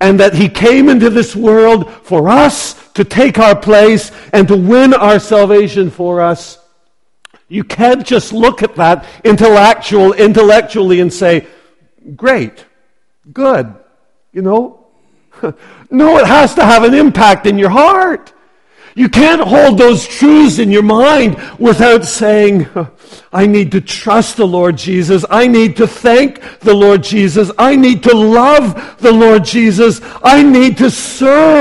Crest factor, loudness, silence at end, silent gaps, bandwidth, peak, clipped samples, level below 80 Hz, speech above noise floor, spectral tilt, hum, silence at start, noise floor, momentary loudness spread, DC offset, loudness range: 8 dB; -8 LUFS; 0 s; none; 12 kHz; 0 dBFS; 2%; -38 dBFS; 55 dB; -5.5 dB/octave; none; 0 s; -62 dBFS; 9 LU; 0.3%; 6 LU